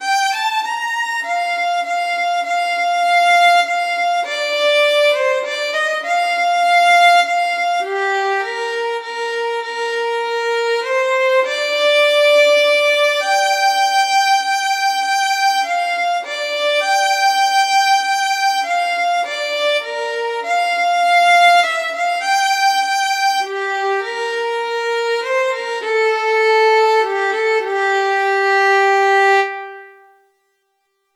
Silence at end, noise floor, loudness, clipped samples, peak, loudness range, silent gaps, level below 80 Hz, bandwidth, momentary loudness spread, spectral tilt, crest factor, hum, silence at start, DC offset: 1.25 s; -68 dBFS; -15 LUFS; under 0.1%; -4 dBFS; 4 LU; none; under -90 dBFS; 16.5 kHz; 9 LU; 2.5 dB/octave; 12 dB; none; 0 s; under 0.1%